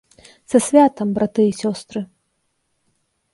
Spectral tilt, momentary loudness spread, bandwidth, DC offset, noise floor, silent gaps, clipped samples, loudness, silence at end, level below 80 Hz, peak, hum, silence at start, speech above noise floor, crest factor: -5.5 dB/octave; 16 LU; 11.5 kHz; under 0.1%; -70 dBFS; none; under 0.1%; -18 LUFS; 1.3 s; -60 dBFS; -2 dBFS; none; 0.5 s; 53 dB; 18 dB